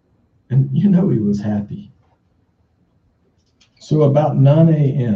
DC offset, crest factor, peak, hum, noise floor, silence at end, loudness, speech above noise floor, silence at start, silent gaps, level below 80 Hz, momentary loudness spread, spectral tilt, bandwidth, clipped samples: under 0.1%; 16 dB; -2 dBFS; none; -60 dBFS; 0 s; -15 LUFS; 46 dB; 0.5 s; none; -54 dBFS; 11 LU; -10 dB/octave; 7.2 kHz; under 0.1%